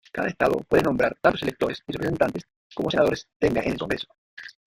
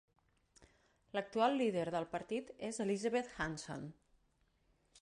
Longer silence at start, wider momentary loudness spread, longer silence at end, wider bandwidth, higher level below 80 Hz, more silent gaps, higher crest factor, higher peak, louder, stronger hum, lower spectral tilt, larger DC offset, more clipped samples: second, 0.15 s vs 0.6 s; first, 15 LU vs 12 LU; second, 0.15 s vs 1.1 s; first, 16 kHz vs 11.5 kHz; first, -50 dBFS vs -70 dBFS; first, 2.56-2.70 s, 3.36-3.40 s, 4.18-4.37 s vs none; about the same, 20 dB vs 20 dB; first, -4 dBFS vs -20 dBFS; first, -24 LUFS vs -39 LUFS; neither; about the same, -6 dB/octave vs -5 dB/octave; neither; neither